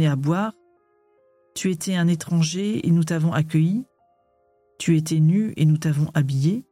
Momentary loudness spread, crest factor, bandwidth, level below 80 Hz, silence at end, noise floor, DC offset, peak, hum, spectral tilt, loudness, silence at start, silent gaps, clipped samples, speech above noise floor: 7 LU; 12 dB; 14.5 kHz; -62 dBFS; 0.1 s; -64 dBFS; under 0.1%; -10 dBFS; none; -6.5 dB/octave; -22 LUFS; 0 s; none; under 0.1%; 43 dB